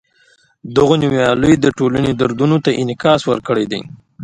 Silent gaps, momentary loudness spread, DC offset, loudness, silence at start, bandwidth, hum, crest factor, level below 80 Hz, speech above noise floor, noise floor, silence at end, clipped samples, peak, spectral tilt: none; 6 LU; under 0.1%; -15 LUFS; 0.65 s; 11 kHz; none; 14 dB; -42 dBFS; 40 dB; -54 dBFS; 0 s; under 0.1%; 0 dBFS; -6.5 dB/octave